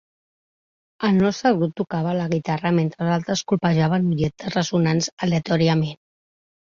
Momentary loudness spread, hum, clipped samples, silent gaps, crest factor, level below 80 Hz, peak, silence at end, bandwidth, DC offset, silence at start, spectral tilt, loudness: 5 LU; none; under 0.1%; 5.12-5.17 s; 18 dB; -56 dBFS; -4 dBFS; 0.8 s; 7.4 kHz; under 0.1%; 1 s; -6 dB/octave; -21 LUFS